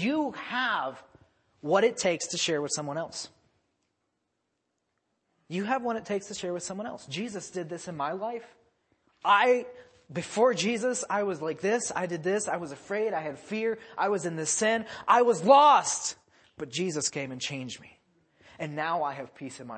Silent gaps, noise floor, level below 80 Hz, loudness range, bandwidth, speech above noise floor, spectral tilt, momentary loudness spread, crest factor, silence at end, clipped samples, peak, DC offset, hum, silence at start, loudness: none; -80 dBFS; -74 dBFS; 11 LU; 8.8 kHz; 52 dB; -3 dB/octave; 15 LU; 22 dB; 0 s; under 0.1%; -6 dBFS; under 0.1%; none; 0 s; -28 LUFS